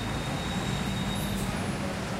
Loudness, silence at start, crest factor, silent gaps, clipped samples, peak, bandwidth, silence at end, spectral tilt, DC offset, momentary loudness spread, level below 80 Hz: -31 LUFS; 0 s; 12 dB; none; under 0.1%; -18 dBFS; 16 kHz; 0 s; -5 dB/octave; under 0.1%; 1 LU; -42 dBFS